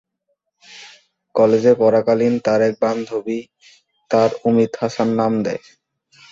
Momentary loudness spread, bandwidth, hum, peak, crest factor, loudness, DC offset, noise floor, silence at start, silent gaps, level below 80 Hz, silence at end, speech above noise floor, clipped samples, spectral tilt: 14 LU; 7.6 kHz; none; -2 dBFS; 16 dB; -18 LUFS; under 0.1%; -72 dBFS; 0.7 s; none; -60 dBFS; 0.75 s; 55 dB; under 0.1%; -7 dB/octave